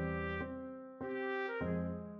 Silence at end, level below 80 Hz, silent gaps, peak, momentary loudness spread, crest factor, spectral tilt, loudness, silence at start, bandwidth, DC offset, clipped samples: 0 s; -56 dBFS; none; -28 dBFS; 8 LU; 12 dB; -6 dB/octave; -40 LUFS; 0 s; 5.8 kHz; under 0.1%; under 0.1%